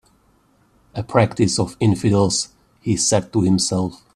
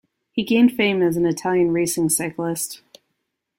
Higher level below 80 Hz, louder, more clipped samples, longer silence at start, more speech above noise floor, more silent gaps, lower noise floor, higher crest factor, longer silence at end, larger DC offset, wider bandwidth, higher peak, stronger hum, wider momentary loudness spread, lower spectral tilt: first, -50 dBFS vs -60 dBFS; about the same, -19 LUFS vs -20 LUFS; neither; first, 0.95 s vs 0.35 s; second, 40 dB vs 57 dB; neither; second, -58 dBFS vs -76 dBFS; about the same, 20 dB vs 16 dB; second, 0.2 s vs 0.8 s; neither; second, 13 kHz vs 16.5 kHz; first, 0 dBFS vs -4 dBFS; neither; about the same, 13 LU vs 11 LU; about the same, -5 dB/octave vs -4.5 dB/octave